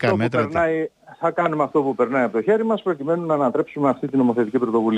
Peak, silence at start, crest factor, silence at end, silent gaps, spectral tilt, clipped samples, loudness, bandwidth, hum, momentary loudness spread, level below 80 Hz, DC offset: -6 dBFS; 0 s; 14 dB; 0 s; none; -8 dB/octave; under 0.1%; -21 LUFS; 9.4 kHz; none; 4 LU; -58 dBFS; under 0.1%